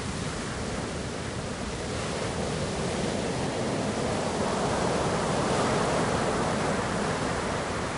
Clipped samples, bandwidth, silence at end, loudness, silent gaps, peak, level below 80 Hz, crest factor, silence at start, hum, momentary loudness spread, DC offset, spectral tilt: under 0.1%; 11 kHz; 0 s; -29 LUFS; none; -14 dBFS; -44 dBFS; 14 dB; 0 s; none; 7 LU; under 0.1%; -4.5 dB/octave